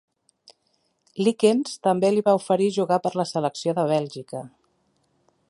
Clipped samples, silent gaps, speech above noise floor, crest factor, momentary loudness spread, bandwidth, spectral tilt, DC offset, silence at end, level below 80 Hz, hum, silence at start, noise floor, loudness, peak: under 0.1%; none; 48 dB; 20 dB; 14 LU; 11.5 kHz; -6 dB/octave; under 0.1%; 1 s; -72 dBFS; none; 1.15 s; -70 dBFS; -22 LUFS; -6 dBFS